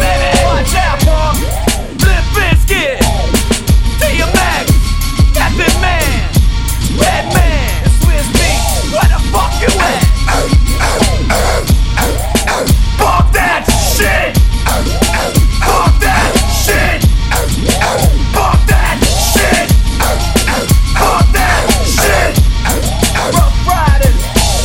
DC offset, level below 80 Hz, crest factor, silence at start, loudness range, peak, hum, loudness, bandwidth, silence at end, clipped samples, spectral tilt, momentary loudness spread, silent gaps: under 0.1%; -12 dBFS; 10 dB; 0 s; 1 LU; 0 dBFS; none; -11 LUFS; 17 kHz; 0 s; under 0.1%; -4 dB/octave; 3 LU; none